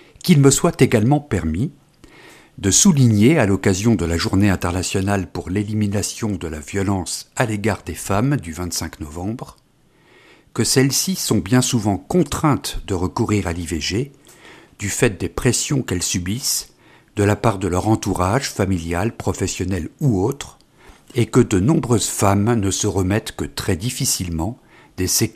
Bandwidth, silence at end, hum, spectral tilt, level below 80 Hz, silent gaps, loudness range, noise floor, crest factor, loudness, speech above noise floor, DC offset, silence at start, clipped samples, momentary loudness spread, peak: 15.5 kHz; 0.05 s; none; -5 dB/octave; -40 dBFS; none; 6 LU; -55 dBFS; 18 dB; -19 LUFS; 37 dB; under 0.1%; 0.25 s; under 0.1%; 11 LU; 0 dBFS